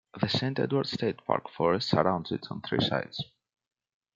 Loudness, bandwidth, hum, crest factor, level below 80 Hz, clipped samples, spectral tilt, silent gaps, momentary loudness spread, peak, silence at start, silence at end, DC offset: -29 LUFS; 7.6 kHz; none; 24 dB; -64 dBFS; under 0.1%; -6.5 dB/octave; none; 10 LU; -6 dBFS; 0.15 s; 0.9 s; under 0.1%